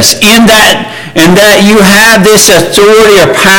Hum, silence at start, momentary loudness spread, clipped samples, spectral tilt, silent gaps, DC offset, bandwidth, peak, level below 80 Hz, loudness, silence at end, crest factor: none; 0 s; 4 LU; 7%; -3 dB/octave; none; under 0.1%; over 20 kHz; 0 dBFS; -30 dBFS; -2 LUFS; 0 s; 2 dB